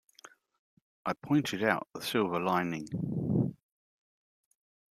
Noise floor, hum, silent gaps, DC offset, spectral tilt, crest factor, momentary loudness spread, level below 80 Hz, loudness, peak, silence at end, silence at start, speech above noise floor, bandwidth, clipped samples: -58 dBFS; none; none; under 0.1%; -6 dB/octave; 24 dB; 7 LU; -68 dBFS; -32 LUFS; -10 dBFS; 1.4 s; 1.05 s; 27 dB; 15 kHz; under 0.1%